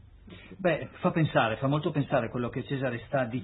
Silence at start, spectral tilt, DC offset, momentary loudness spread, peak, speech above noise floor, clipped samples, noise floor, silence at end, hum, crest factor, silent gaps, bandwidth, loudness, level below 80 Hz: 0 s; -11 dB/octave; under 0.1%; 7 LU; -10 dBFS; 21 dB; under 0.1%; -49 dBFS; 0 s; none; 20 dB; none; 4.1 kHz; -29 LUFS; -56 dBFS